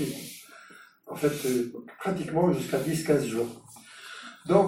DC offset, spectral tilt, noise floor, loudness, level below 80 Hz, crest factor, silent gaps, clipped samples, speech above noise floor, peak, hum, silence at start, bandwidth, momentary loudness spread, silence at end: under 0.1%; -6 dB/octave; -52 dBFS; -28 LUFS; -62 dBFS; 22 dB; none; under 0.1%; 25 dB; -6 dBFS; none; 0 s; 16.5 kHz; 19 LU; 0 s